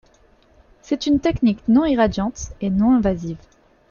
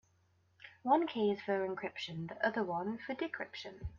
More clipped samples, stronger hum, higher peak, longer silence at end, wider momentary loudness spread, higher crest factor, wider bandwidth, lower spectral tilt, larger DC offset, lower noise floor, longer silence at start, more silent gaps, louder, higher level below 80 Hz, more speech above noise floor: neither; neither; first, -4 dBFS vs -18 dBFS; first, 0.55 s vs 0 s; about the same, 11 LU vs 12 LU; about the same, 16 dB vs 20 dB; about the same, 7.2 kHz vs 7.2 kHz; first, -6.5 dB/octave vs -3.5 dB/octave; neither; second, -54 dBFS vs -73 dBFS; first, 0.9 s vs 0.6 s; neither; first, -19 LUFS vs -37 LUFS; first, -40 dBFS vs -62 dBFS; about the same, 36 dB vs 36 dB